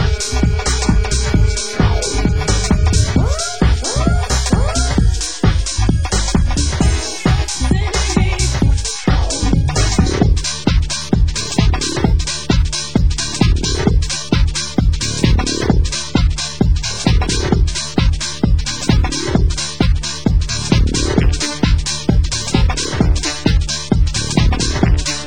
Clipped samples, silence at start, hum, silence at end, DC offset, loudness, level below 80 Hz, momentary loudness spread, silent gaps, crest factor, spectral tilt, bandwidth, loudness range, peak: under 0.1%; 0 s; none; 0 s; 3%; -16 LUFS; -18 dBFS; 2 LU; none; 14 dB; -4.5 dB/octave; 16 kHz; 1 LU; 0 dBFS